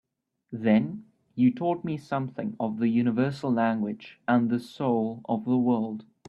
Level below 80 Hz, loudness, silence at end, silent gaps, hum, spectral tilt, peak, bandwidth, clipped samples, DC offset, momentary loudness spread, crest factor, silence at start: -68 dBFS; -27 LUFS; 0.25 s; none; none; -8.5 dB/octave; -10 dBFS; 7 kHz; under 0.1%; under 0.1%; 10 LU; 16 dB; 0.5 s